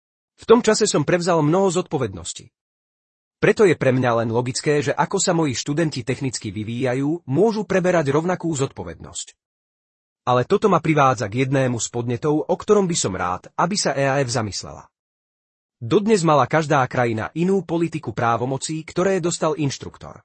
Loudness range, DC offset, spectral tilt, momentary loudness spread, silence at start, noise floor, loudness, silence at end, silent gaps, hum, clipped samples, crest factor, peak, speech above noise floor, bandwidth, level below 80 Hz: 3 LU; under 0.1%; -5 dB/octave; 11 LU; 0.4 s; under -90 dBFS; -20 LUFS; 0.1 s; 2.61-3.31 s, 9.45-10.16 s, 14.99-15.69 s; none; under 0.1%; 18 dB; -2 dBFS; over 70 dB; 8.8 kHz; -56 dBFS